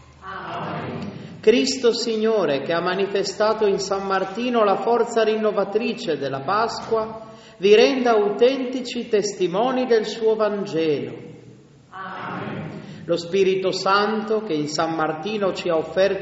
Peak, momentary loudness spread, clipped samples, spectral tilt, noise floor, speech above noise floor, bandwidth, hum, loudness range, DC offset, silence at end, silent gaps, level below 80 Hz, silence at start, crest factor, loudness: -2 dBFS; 13 LU; under 0.1%; -3.5 dB/octave; -47 dBFS; 27 dB; 8 kHz; none; 5 LU; under 0.1%; 0 s; none; -60 dBFS; 0.2 s; 18 dB; -21 LUFS